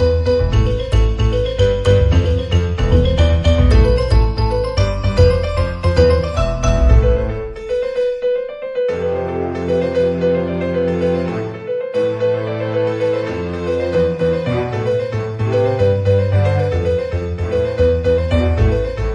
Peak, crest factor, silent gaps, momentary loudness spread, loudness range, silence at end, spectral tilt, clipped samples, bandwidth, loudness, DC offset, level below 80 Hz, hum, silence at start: 0 dBFS; 14 dB; none; 7 LU; 4 LU; 0 s; -7.5 dB/octave; under 0.1%; 10.5 kHz; -17 LUFS; under 0.1%; -22 dBFS; none; 0 s